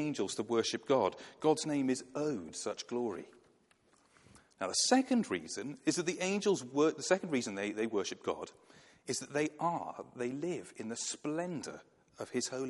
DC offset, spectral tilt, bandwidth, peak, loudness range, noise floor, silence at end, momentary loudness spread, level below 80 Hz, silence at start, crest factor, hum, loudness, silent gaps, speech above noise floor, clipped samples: under 0.1%; -3.5 dB/octave; 11.5 kHz; -16 dBFS; 6 LU; -69 dBFS; 0 s; 11 LU; -80 dBFS; 0 s; 20 dB; none; -35 LUFS; none; 34 dB; under 0.1%